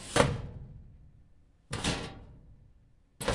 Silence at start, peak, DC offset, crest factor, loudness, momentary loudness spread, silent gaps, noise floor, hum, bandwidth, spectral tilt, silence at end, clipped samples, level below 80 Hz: 0 s; -6 dBFS; under 0.1%; 30 dB; -33 LUFS; 25 LU; none; -62 dBFS; none; 11.5 kHz; -4 dB/octave; 0 s; under 0.1%; -48 dBFS